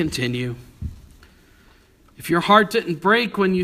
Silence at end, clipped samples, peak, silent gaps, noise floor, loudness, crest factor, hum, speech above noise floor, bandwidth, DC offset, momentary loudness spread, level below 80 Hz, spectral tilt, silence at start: 0 s; under 0.1%; 0 dBFS; none; -53 dBFS; -19 LUFS; 22 dB; none; 34 dB; 15.5 kHz; under 0.1%; 20 LU; -46 dBFS; -5.5 dB/octave; 0 s